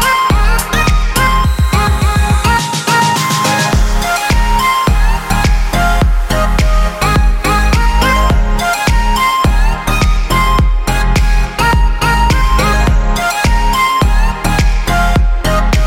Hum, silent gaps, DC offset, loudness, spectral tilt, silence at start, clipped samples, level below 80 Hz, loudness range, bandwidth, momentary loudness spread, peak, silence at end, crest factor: none; none; under 0.1%; -12 LUFS; -4.5 dB/octave; 0 s; under 0.1%; -12 dBFS; 1 LU; 16.5 kHz; 3 LU; 0 dBFS; 0 s; 10 dB